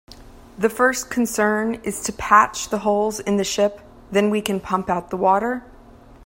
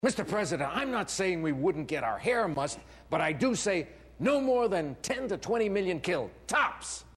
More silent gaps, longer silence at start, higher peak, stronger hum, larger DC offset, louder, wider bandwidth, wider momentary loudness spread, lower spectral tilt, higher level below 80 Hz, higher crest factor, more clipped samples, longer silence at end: neither; about the same, 0.1 s vs 0.05 s; first, 0 dBFS vs -14 dBFS; neither; neither; first, -20 LUFS vs -30 LUFS; first, 16.5 kHz vs 13.5 kHz; first, 9 LU vs 6 LU; about the same, -4 dB/octave vs -4.5 dB/octave; first, -48 dBFS vs -58 dBFS; about the same, 20 dB vs 16 dB; neither; first, 0.6 s vs 0.05 s